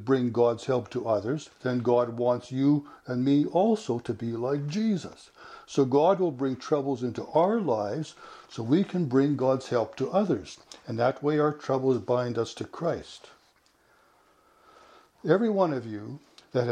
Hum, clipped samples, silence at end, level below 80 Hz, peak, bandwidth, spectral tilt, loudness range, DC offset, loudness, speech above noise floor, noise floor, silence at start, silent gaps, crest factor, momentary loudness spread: none; under 0.1%; 0 s; -68 dBFS; -8 dBFS; 10 kHz; -7.5 dB/octave; 5 LU; under 0.1%; -27 LUFS; 38 dB; -64 dBFS; 0 s; none; 18 dB; 13 LU